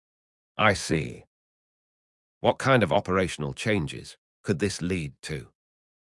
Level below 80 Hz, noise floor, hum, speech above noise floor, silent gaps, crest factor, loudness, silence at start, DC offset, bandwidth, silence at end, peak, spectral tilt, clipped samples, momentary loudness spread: -54 dBFS; under -90 dBFS; none; over 64 dB; 1.27-2.41 s, 4.18-4.44 s, 5.19-5.23 s; 24 dB; -26 LUFS; 0.55 s; under 0.1%; 12 kHz; 0.75 s; -6 dBFS; -5 dB/octave; under 0.1%; 16 LU